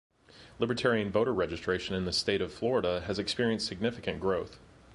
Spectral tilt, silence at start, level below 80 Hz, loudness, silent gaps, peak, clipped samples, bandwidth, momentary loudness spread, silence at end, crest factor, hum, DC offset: -5 dB/octave; 0.35 s; -54 dBFS; -31 LUFS; none; -14 dBFS; under 0.1%; 11.5 kHz; 5 LU; 0 s; 18 dB; none; under 0.1%